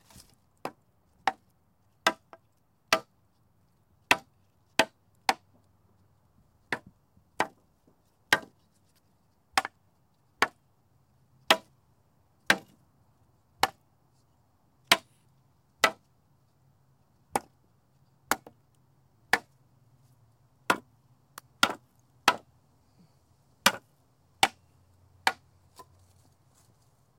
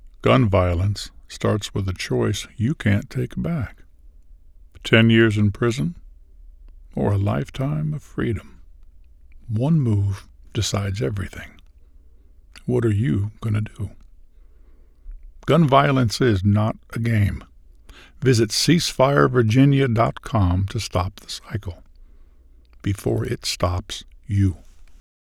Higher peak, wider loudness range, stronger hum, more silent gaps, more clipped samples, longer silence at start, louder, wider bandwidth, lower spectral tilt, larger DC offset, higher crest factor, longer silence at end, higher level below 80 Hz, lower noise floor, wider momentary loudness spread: second, -6 dBFS vs 0 dBFS; second, 5 LU vs 8 LU; neither; neither; neither; first, 0.65 s vs 0.05 s; second, -29 LUFS vs -21 LUFS; about the same, 16.5 kHz vs 15 kHz; second, -1 dB/octave vs -6 dB/octave; neither; first, 30 dB vs 22 dB; first, 1.85 s vs 0.3 s; second, -72 dBFS vs -42 dBFS; first, -70 dBFS vs -49 dBFS; about the same, 17 LU vs 15 LU